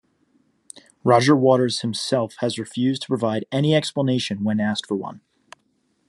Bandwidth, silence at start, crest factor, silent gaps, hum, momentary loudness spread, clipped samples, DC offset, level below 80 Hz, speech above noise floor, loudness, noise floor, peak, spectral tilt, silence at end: 12 kHz; 0.75 s; 20 dB; none; none; 10 LU; under 0.1%; under 0.1%; -66 dBFS; 47 dB; -21 LUFS; -67 dBFS; -2 dBFS; -5.5 dB/octave; 0.9 s